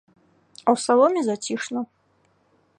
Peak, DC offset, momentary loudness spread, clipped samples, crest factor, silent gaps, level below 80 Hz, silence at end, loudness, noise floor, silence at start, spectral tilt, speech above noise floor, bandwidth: -4 dBFS; under 0.1%; 13 LU; under 0.1%; 20 dB; none; -78 dBFS; 0.95 s; -22 LUFS; -64 dBFS; 0.65 s; -4 dB/octave; 43 dB; 11 kHz